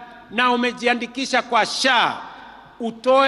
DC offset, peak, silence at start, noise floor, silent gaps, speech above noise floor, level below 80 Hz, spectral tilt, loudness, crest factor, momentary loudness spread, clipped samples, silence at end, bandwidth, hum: under 0.1%; -6 dBFS; 0 s; -42 dBFS; none; 22 dB; -62 dBFS; -2 dB/octave; -19 LUFS; 16 dB; 14 LU; under 0.1%; 0 s; 12 kHz; none